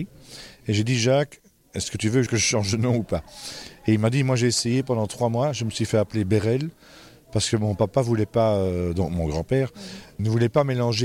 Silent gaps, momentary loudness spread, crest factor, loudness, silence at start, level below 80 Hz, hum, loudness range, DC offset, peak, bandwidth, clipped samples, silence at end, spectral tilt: none; 13 LU; 14 dB; -23 LUFS; 0 s; -46 dBFS; none; 1 LU; under 0.1%; -8 dBFS; 15 kHz; under 0.1%; 0 s; -5.5 dB/octave